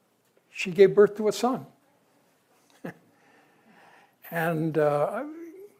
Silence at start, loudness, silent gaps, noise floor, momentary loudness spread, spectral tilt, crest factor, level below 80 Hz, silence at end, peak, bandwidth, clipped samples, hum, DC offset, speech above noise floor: 0.55 s; -24 LUFS; none; -67 dBFS; 24 LU; -6 dB/octave; 22 dB; -76 dBFS; 0.15 s; -6 dBFS; 16 kHz; under 0.1%; none; under 0.1%; 44 dB